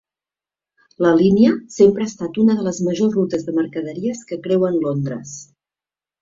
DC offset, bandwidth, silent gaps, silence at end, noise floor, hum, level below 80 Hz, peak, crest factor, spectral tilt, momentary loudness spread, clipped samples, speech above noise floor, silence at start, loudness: under 0.1%; 7.8 kHz; none; 0.8 s; under -90 dBFS; none; -56 dBFS; -2 dBFS; 16 dB; -7 dB/octave; 12 LU; under 0.1%; over 73 dB; 1 s; -18 LUFS